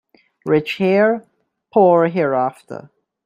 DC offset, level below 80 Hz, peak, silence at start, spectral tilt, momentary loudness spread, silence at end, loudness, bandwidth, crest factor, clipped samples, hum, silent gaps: under 0.1%; -64 dBFS; -2 dBFS; 0.45 s; -8 dB/octave; 20 LU; 0.45 s; -17 LUFS; 14 kHz; 16 dB; under 0.1%; none; none